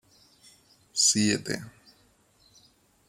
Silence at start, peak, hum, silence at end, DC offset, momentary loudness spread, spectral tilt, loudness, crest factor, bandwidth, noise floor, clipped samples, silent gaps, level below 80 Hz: 0.95 s; -10 dBFS; none; 1.4 s; under 0.1%; 15 LU; -2 dB/octave; -25 LUFS; 22 dB; 16 kHz; -63 dBFS; under 0.1%; none; -70 dBFS